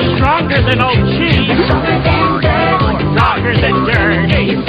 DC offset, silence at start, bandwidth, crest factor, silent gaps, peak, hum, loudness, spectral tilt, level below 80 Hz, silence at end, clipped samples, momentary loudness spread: under 0.1%; 0 s; 6.4 kHz; 12 dB; none; 0 dBFS; none; -12 LUFS; -8 dB/octave; -26 dBFS; 0 s; under 0.1%; 1 LU